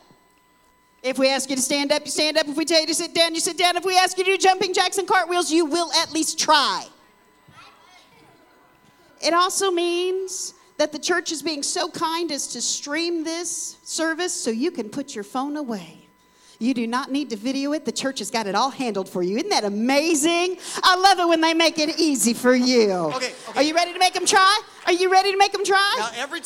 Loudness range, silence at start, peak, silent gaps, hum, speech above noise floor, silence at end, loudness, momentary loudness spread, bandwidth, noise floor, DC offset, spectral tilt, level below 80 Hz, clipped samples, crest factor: 8 LU; 1.05 s; -4 dBFS; none; none; 37 dB; 0 s; -21 LUFS; 10 LU; 17 kHz; -59 dBFS; under 0.1%; -1.5 dB/octave; -68 dBFS; under 0.1%; 18 dB